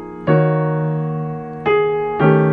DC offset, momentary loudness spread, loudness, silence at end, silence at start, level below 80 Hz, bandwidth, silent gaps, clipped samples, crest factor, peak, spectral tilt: under 0.1%; 8 LU; -18 LUFS; 0 s; 0 s; -50 dBFS; 4.2 kHz; none; under 0.1%; 16 dB; -2 dBFS; -10.5 dB/octave